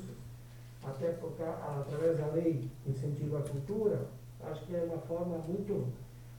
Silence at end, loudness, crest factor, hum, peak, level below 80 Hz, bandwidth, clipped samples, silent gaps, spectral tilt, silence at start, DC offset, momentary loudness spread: 0 s; -36 LUFS; 18 dB; 60 Hz at -50 dBFS; -18 dBFS; -60 dBFS; 19 kHz; under 0.1%; none; -8.5 dB/octave; 0 s; under 0.1%; 14 LU